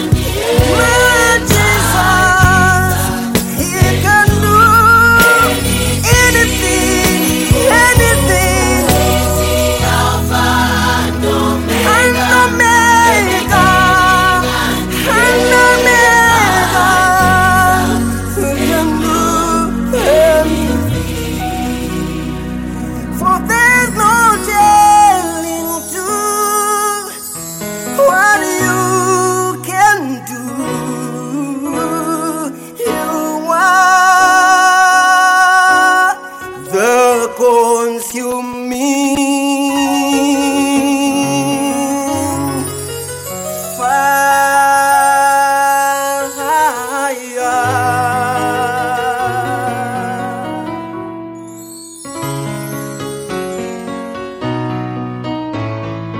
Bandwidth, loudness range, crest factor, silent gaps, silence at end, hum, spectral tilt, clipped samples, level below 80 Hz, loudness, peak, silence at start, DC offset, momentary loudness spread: 17 kHz; 10 LU; 12 dB; none; 0 s; none; -4 dB/octave; under 0.1%; -28 dBFS; -11 LUFS; 0 dBFS; 0 s; under 0.1%; 14 LU